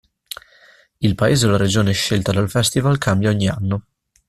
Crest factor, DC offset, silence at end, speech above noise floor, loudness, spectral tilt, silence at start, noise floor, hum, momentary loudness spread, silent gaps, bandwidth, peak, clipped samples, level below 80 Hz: 16 dB; under 0.1%; 0.5 s; 34 dB; -18 LUFS; -5 dB/octave; 1 s; -51 dBFS; none; 15 LU; none; 14.5 kHz; -2 dBFS; under 0.1%; -44 dBFS